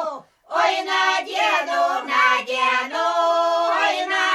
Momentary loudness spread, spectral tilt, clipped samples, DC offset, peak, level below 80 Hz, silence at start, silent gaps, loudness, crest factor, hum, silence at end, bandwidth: 3 LU; 0 dB/octave; under 0.1%; under 0.1%; -6 dBFS; -72 dBFS; 0 s; none; -19 LUFS; 14 dB; none; 0 s; 13 kHz